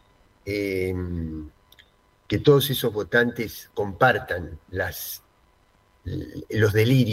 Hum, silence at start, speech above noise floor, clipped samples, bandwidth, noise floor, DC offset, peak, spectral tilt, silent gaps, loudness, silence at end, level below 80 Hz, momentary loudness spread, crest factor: none; 0.45 s; 38 dB; under 0.1%; 16 kHz; -61 dBFS; under 0.1%; -4 dBFS; -6 dB/octave; none; -24 LUFS; 0 s; -48 dBFS; 16 LU; 22 dB